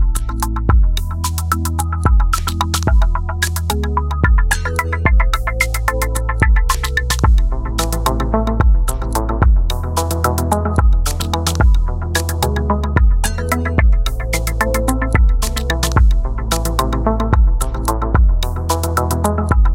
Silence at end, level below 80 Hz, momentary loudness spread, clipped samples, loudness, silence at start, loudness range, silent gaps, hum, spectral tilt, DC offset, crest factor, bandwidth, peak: 0 s; -16 dBFS; 4 LU; under 0.1%; -17 LUFS; 0 s; 1 LU; none; none; -5 dB/octave; under 0.1%; 14 dB; 17 kHz; 0 dBFS